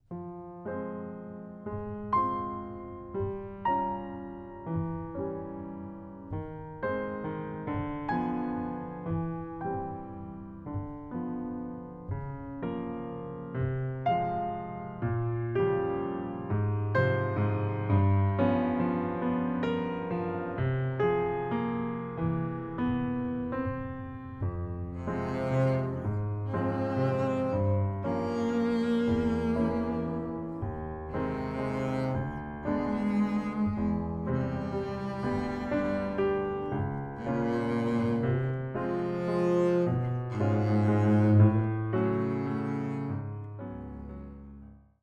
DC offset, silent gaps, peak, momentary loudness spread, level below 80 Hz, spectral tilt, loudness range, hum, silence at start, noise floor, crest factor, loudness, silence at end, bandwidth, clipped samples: under 0.1%; none; -10 dBFS; 13 LU; -52 dBFS; -9.5 dB/octave; 9 LU; none; 0.1 s; -50 dBFS; 20 dB; -31 LUFS; 0.25 s; 7.2 kHz; under 0.1%